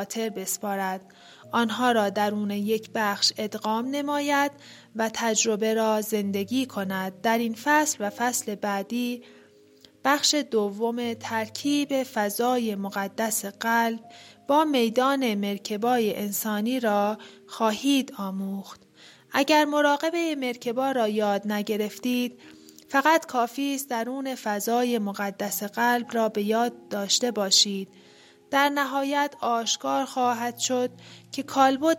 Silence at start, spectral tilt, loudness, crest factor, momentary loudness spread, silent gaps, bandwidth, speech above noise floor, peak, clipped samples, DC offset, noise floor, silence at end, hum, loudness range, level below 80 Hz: 0 s; -3 dB/octave; -25 LUFS; 20 dB; 8 LU; none; 16.5 kHz; 30 dB; -6 dBFS; under 0.1%; under 0.1%; -55 dBFS; 0 s; none; 3 LU; -76 dBFS